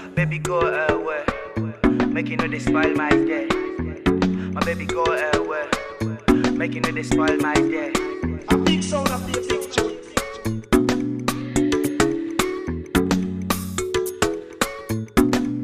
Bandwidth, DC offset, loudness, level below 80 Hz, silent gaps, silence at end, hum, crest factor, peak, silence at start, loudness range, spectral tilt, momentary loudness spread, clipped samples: 15.5 kHz; under 0.1%; -22 LUFS; -38 dBFS; none; 0 s; none; 20 dB; -2 dBFS; 0 s; 2 LU; -5 dB/octave; 7 LU; under 0.1%